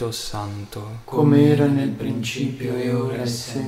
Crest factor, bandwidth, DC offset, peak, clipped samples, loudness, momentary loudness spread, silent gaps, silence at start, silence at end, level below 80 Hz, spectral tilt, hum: 16 dB; 15.5 kHz; under 0.1%; -4 dBFS; under 0.1%; -21 LUFS; 16 LU; none; 0 s; 0 s; -50 dBFS; -6.5 dB/octave; none